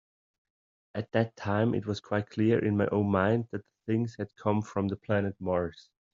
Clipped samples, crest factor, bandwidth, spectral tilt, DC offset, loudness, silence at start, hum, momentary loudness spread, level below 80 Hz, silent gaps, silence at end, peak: under 0.1%; 20 dB; 7.4 kHz; -7 dB/octave; under 0.1%; -30 LUFS; 0.95 s; none; 9 LU; -66 dBFS; none; 0.35 s; -10 dBFS